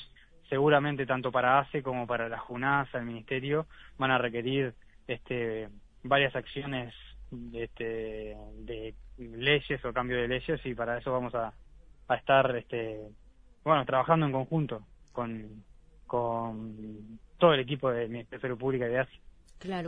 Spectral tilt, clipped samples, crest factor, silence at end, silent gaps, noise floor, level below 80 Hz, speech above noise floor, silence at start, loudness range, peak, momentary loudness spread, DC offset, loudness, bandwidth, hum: -8 dB/octave; under 0.1%; 22 dB; 0 s; none; -55 dBFS; -54 dBFS; 24 dB; 0 s; 5 LU; -8 dBFS; 19 LU; under 0.1%; -30 LUFS; 8.2 kHz; none